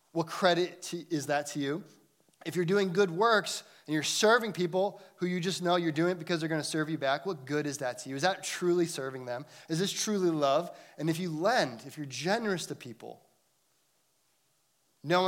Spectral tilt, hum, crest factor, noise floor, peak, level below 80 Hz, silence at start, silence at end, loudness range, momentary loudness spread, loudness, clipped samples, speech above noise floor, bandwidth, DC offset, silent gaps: -4 dB/octave; none; 22 dB; -73 dBFS; -10 dBFS; -84 dBFS; 0.15 s; 0 s; 5 LU; 13 LU; -30 LUFS; under 0.1%; 43 dB; 16.5 kHz; under 0.1%; none